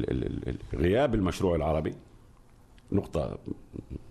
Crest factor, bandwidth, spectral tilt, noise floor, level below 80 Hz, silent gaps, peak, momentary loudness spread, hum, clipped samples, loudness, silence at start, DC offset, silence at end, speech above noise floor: 18 dB; 13 kHz; -7.5 dB/octave; -55 dBFS; -42 dBFS; none; -12 dBFS; 16 LU; none; under 0.1%; -30 LUFS; 0 s; under 0.1%; 0 s; 26 dB